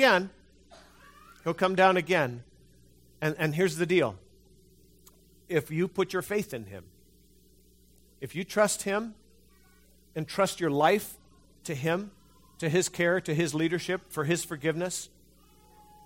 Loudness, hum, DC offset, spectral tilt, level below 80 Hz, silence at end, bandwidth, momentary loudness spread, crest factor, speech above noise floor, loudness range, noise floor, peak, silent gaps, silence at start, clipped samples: -28 LUFS; none; under 0.1%; -4.5 dB/octave; -64 dBFS; 1 s; 16.5 kHz; 17 LU; 22 dB; 33 dB; 6 LU; -61 dBFS; -8 dBFS; none; 0 s; under 0.1%